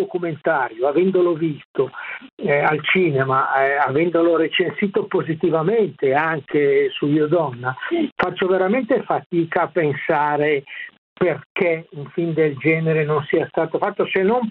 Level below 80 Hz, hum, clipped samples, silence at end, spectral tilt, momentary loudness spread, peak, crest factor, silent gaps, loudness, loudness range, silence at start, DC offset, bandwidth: -64 dBFS; none; under 0.1%; 0 s; -9.5 dB/octave; 7 LU; -2 dBFS; 18 dB; 1.65-1.74 s, 2.32-2.37 s, 8.12-8.16 s, 9.26-9.30 s, 10.98-11.16 s, 11.45-11.55 s; -19 LUFS; 3 LU; 0 s; under 0.1%; 4.5 kHz